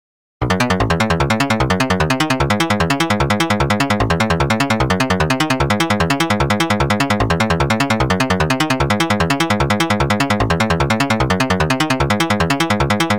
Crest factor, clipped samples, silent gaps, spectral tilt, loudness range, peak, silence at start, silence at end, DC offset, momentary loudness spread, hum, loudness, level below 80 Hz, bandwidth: 8 dB; under 0.1%; none; -5 dB/octave; 0 LU; -8 dBFS; 0.4 s; 0 s; 0.7%; 0 LU; none; -16 LUFS; -30 dBFS; 19 kHz